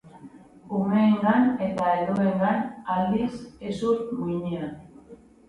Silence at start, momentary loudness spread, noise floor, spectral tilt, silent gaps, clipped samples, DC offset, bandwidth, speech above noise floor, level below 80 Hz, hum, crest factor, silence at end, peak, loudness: 0.05 s; 12 LU; -49 dBFS; -8 dB/octave; none; under 0.1%; under 0.1%; 10.5 kHz; 25 dB; -58 dBFS; none; 18 dB; 0.35 s; -8 dBFS; -25 LUFS